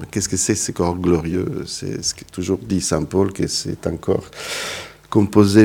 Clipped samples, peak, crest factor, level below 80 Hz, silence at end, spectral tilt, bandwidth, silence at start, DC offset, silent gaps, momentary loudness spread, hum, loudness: under 0.1%; 0 dBFS; 20 dB; -44 dBFS; 0 s; -5 dB/octave; 18 kHz; 0 s; under 0.1%; none; 9 LU; none; -20 LUFS